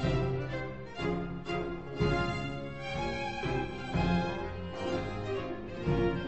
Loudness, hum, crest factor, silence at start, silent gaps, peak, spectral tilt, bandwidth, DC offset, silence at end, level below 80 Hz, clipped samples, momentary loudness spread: -34 LUFS; none; 16 dB; 0 s; none; -16 dBFS; -7 dB/octave; 8.4 kHz; 0.3%; 0 s; -44 dBFS; under 0.1%; 8 LU